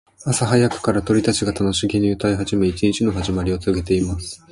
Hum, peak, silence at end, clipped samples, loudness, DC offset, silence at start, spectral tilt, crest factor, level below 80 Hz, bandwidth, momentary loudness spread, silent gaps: none; -4 dBFS; 0.15 s; under 0.1%; -20 LUFS; under 0.1%; 0.2 s; -5.5 dB/octave; 16 dB; -36 dBFS; 11.5 kHz; 5 LU; none